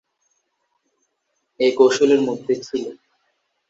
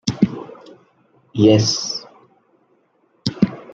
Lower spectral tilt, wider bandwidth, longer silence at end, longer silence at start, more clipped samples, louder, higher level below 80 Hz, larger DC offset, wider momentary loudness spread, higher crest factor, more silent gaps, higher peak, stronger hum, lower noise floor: second, -4 dB/octave vs -5.5 dB/octave; about the same, 7.8 kHz vs 7.8 kHz; first, 0.75 s vs 0 s; first, 1.6 s vs 0.05 s; neither; about the same, -18 LUFS vs -19 LUFS; second, -68 dBFS vs -54 dBFS; neither; second, 13 LU vs 17 LU; about the same, 20 dB vs 20 dB; neither; about the same, -2 dBFS vs -2 dBFS; neither; first, -73 dBFS vs -61 dBFS